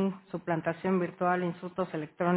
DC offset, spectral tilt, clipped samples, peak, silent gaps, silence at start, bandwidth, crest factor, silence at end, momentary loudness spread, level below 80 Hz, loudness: under 0.1%; -6.5 dB/octave; under 0.1%; -14 dBFS; none; 0 s; 4 kHz; 18 dB; 0 s; 6 LU; -72 dBFS; -32 LUFS